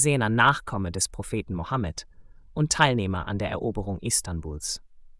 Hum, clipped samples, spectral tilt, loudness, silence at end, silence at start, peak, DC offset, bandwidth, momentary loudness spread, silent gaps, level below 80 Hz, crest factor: none; under 0.1%; -4 dB/octave; -26 LUFS; 0.05 s; 0 s; -4 dBFS; under 0.1%; 12 kHz; 12 LU; none; -44 dBFS; 22 dB